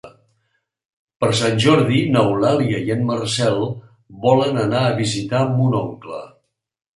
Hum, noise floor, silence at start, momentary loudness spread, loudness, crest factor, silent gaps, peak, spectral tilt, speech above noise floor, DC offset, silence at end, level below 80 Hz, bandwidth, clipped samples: none; -70 dBFS; 0.05 s; 11 LU; -18 LUFS; 18 dB; 0.85-1.08 s, 1.16-1.20 s; -2 dBFS; -6 dB/octave; 52 dB; under 0.1%; 0.7 s; -54 dBFS; 11.5 kHz; under 0.1%